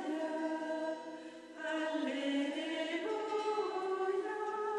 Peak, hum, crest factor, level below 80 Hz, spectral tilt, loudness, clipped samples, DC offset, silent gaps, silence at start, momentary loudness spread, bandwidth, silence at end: -24 dBFS; none; 14 dB; -86 dBFS; -3 dB/octave; -37 LUFS; under 0.1%; under 0.1%; none; 0 s; 8 LU; 11 kHz; 0 s